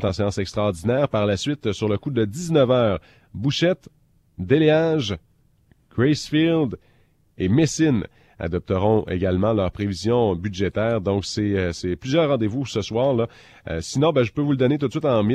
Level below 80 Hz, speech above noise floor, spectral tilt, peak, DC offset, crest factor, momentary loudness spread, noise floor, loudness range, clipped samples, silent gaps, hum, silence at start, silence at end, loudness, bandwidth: -48 dBFS; 38 dB; -6.5 dB/octave; -6 dBFS; under 0.1%; 16 dB; 9 LU; -59 dBFS; 1 LU; under 0.1%; none; none; 0 s; 0 s; -22 LUFS; 12.5 kHz